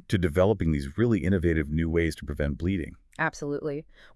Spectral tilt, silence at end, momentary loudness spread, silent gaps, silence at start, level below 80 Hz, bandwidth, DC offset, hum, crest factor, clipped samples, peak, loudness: -7.5 dB/octave; 0.35 s; 9 LU; none; 0.1 s; -42 dBFS; 12 kHz; under 0.1%; none; 16 dB; under 0.1%; -10 dBFS; -27 LUFS